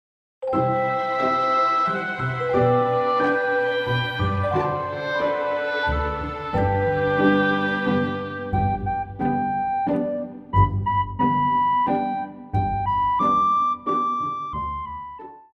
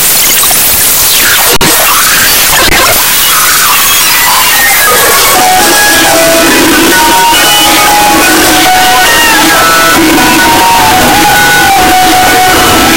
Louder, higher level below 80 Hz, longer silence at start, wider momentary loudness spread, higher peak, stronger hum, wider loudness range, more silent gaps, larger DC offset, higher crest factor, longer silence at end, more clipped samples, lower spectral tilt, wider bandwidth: second, -22 LUFS vs -2 LUFS; second, -42 dBFS vs -26 dBFS; first, 0.4 s vs 0 s; first, 9 LU vs 1 LU; second, -6 dBFS vs 0 dBFS; neither; first, 3 LU vs 0 LU; neither; second, under 0.1% vs 5%; first, 16 dB vs 4 dB; first, 0.15 s vs 0 s; second, under 0.1% vs 3%; first, -8 dB/octave vs -1 dB/octave; second, 7.4 kHz vs over 20 kHz